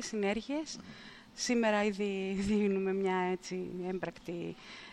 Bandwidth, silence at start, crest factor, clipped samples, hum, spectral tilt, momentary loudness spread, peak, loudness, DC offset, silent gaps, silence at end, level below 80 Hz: 12 kHz; 0 s; 14 dB; under 0.1%; none; -5 dB/octave; 14 LU; -20 dBFS; -34 LUFS; under 0.1%; none; 0 s; -60 dBFS